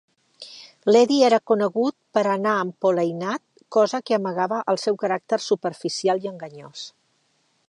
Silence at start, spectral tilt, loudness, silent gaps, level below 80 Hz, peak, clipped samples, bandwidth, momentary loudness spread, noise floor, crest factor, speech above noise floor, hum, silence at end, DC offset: 0.4 s; -5 dB/octave; -22 LUFS; none; -78 dBFS; -6 dBFS; under 0.1%; 10.5 kHz; 20 LU; -67 dBFS; 18 dB; 45 dB; none; 0.8 s; under 0.1%